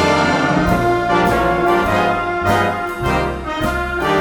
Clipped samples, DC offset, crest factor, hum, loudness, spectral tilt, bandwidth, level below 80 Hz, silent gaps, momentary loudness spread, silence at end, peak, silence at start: under 0.1%; under 0.1%; 14 dB; none; -16 LUFS; -5.5 dB/octave; 19.5 kHz; -32 dBFS; none; 5 LU; 0 s; -2 dBFS; 0 s